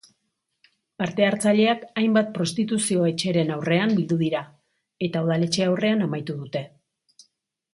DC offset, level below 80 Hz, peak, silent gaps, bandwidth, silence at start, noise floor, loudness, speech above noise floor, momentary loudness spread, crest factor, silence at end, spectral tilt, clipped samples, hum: under 0.1%; -66 dBFS; -6 dBFS; none; 11.5 kHz; 1 s; -77 dBFS; -23 LUFS; 54 dB; 10 LU; 18 dB; 1.05 s; -5.5 dB/octave; under 0.1%; none